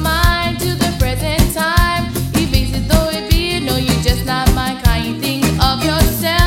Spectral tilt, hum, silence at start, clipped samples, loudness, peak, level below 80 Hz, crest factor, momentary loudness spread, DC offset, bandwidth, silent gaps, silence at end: -4.5 dB/octave; none; 0 s; under 0.1%; -15 LUFS; 0 dBFS; -20 dBFS; 14 dB; 3 LU; under 0.1%; 16.5 kHz; none; 0 s